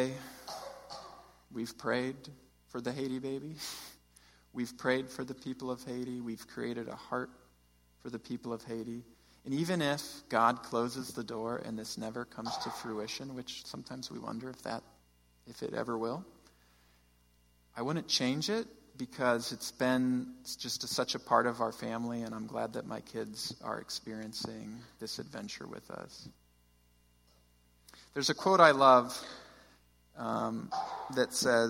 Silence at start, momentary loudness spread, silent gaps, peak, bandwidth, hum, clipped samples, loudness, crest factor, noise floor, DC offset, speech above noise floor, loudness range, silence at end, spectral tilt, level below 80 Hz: 0 s; 16 LU; none; -8 dBFS; 16.5 kHz; 60 Hz at -65 dBFS; under 0.1%; -34 LUFS; 28 dB; -68 dBFS; under 0.1%; 33 dB; 13 LU; 0 s; -4 dB/octave; -70 dBFS